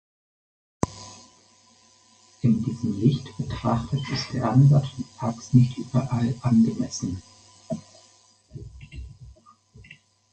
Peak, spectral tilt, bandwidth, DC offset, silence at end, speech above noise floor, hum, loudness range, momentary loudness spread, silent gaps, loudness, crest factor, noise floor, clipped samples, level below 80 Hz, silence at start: -4 dBFS; -7 dB/octave; 8.8 kHz; under 0.1%; 0.4 s; 35 dB; none; 9 LU; 23 LU; none; -24 LUFS; 22 dB; -57 dBFS; under 0.1%; -48 dBFS; 0.85 s